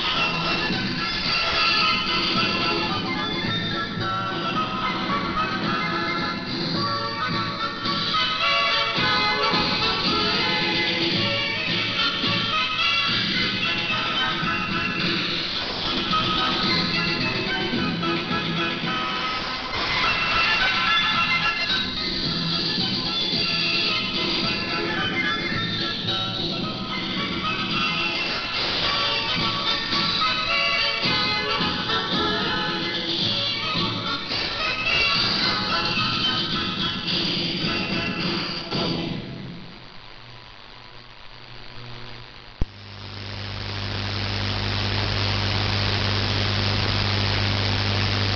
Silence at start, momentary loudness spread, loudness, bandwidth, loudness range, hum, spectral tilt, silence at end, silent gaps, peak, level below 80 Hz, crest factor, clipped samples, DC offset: 0 s; 8 LU; -22 LUFS; 7 kHz; 7 LU; none; -4.5 dB/octave; 0 s; none; -8 dBFS; -42 dBFS; 16 dB; under 0.1%; under 0.1%